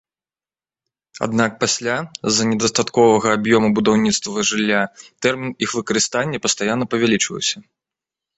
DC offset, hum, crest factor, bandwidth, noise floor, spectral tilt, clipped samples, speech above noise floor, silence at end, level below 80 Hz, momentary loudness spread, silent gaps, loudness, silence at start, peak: under 0.1%; none; 18 dB; 8.2 kHz; under -90 dBFS; -3.5 dB/octave; under 0.1%; over 72 dB; 0.8 s; -56 dBFS; 7 LU; none; -18 LUFS; 1.15 s; -2 dBFS